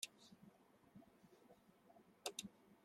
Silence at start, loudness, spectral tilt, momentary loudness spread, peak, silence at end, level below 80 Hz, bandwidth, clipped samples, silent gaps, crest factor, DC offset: 0 s; -53 LUFS; -1.5 dB/octave; 19 LU; -28 dBFS; 0 s; under -90 dBFS; 16.5 kHz; under 0.1%; none; 30 dB; under 0.1%